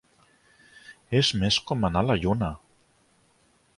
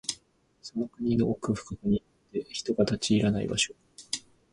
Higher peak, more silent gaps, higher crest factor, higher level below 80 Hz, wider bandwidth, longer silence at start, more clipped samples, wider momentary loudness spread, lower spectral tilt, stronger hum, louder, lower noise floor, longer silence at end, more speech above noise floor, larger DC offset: about the same, -8 dBFS vs -10 dBFS; neither; about the same, 20 dB vs 20 dB; first, -46 dBFS vs -54 dBFS; about the same, 11.5 kHz vs 11.5 kHz; first, 0.9 s vs 0.1 s; neither; second, 7 LU vs 12 LU; about the same, -5 dB/octave vs -4.5 dB/octave; neither; first, -25 LUFS vs -30 LUFS; about the same, -64 dBFS vs -63 dBFS; first, 1.2 s vs 0.35 s; first, 40 dB vs 35 dB; neither